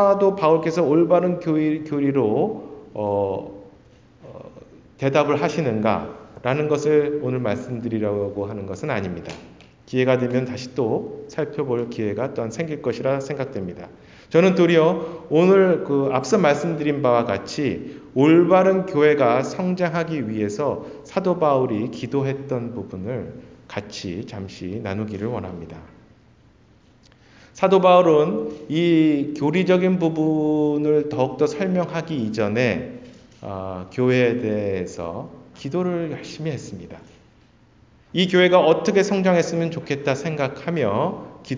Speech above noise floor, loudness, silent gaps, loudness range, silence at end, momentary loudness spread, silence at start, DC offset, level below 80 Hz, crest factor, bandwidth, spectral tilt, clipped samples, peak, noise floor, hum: 34 dB; -21 LUFS; none; 10 LU; 0 s; 15 LU; 0 s; under 0.1%; -54 dBFS; 18 dB; 7.6 kHz; -6.5 dB/octave; under 0.1%; -2 dBFS; -54 dBFS; none